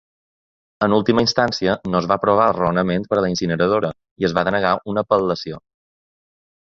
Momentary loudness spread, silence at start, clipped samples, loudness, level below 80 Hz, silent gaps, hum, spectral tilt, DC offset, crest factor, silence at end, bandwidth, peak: 7 LU; 0.8 s; under 0.1%; -19 LUFS; -50 dBFS; 4.11-4.16 s; none; -5.5 dB/octave; under 0.1%; 18 dB; 1.15 s; 7.6 kHz; -2 dBFS